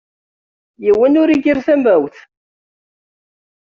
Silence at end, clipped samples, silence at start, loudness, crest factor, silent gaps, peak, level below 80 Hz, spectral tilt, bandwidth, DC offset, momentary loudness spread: 1.6 s; under 0.1%; 0.8 s; -13 LUFS; 14 dB; none; -2 dBFS; -54 dBFS; -4.5 dB/octave; 7 kHz; under 0.1%; 7 LU